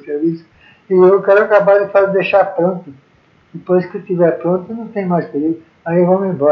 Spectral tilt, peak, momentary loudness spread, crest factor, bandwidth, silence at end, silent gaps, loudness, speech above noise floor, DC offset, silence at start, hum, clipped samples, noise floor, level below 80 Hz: -10 dB/octave; 0 dBFS; 11 LU; 14 dB; 5.6 kHz; 0 s; none; -14 LUFS; 38 dB; under 0.1%; 0.05 s; none; under 0.1%; -51 dBFS; -64 dBFS